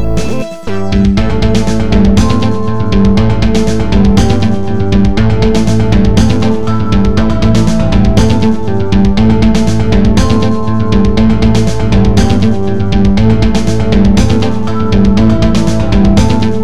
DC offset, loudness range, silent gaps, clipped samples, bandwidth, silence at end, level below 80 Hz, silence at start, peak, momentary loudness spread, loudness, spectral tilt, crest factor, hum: 20%; 1 LU; none; 1%; 12 kHz; 0 s; -16 dBFS; 0 s; 0 dBFS; 4 LU; -10 LUFS; -7 dB/octave; 10 dB; none